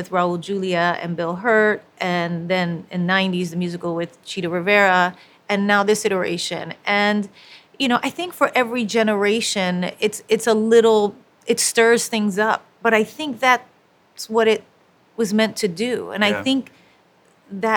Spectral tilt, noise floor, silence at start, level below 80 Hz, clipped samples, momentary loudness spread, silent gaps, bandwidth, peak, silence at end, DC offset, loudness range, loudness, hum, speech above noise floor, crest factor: -4 dB/octave; -56 dBFS; 0 s; -68 dBFS; under 0.1%; 10 LU; none; 19.5 kHz; 0 dBFS; 0 s; under 0.1%; 4 LU; -19 LUFS; none; 37 dB; 20 dB